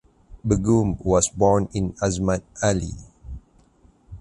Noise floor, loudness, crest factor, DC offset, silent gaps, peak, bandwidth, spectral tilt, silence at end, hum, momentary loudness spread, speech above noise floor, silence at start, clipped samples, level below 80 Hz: -56 dBFS; -22 LUFS; 18 dB; under 0.1%; none; -4 dBFS; 11.5 kHz; -6 dB/octave; 0.05 s; none; 22 LU; 35 dB; 0.3 s; under 0.1%; -38 dBFS